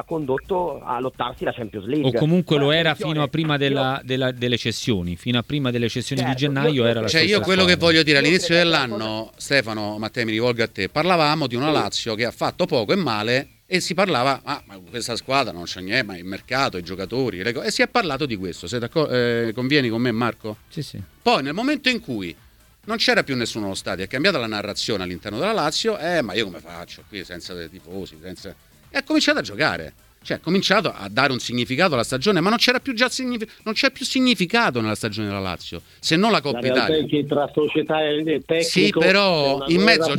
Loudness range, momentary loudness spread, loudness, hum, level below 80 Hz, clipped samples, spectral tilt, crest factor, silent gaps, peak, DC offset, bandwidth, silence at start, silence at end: 6 LU; 13 LU; -21 LUFS; none; -52 dBFS; under 0.1%; -4.5 dB/octave; 22 dB; none; 0 dBFS; under 0.1%; 19 kHz; 0.1 s; 0 s